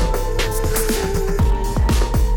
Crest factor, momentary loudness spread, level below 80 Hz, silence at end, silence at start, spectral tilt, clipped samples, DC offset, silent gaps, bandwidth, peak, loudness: 10 dB; 3 LU; -18 dBFS; 0 s; 0 s; -5 dB/octave; under 0.1%; under 0.1%; none; 19 kHz; -8 dBFS; -20 LUFS